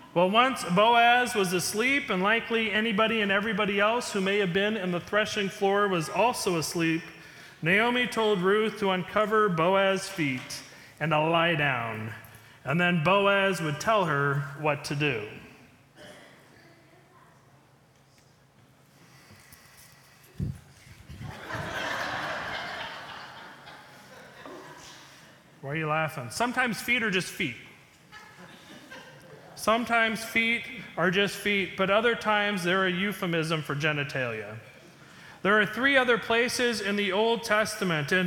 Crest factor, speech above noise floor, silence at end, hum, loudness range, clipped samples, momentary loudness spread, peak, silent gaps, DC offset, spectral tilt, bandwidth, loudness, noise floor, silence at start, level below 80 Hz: 20 dB; 34 dB; 0 s; none; 11 LU; under 0.1%; 20 LU; -8 dBFS; none; under 0.1%; -4.5 dB/octave; 19 kHz; -26 LUFS; -60 dBFS; 0 s; -62 dBFS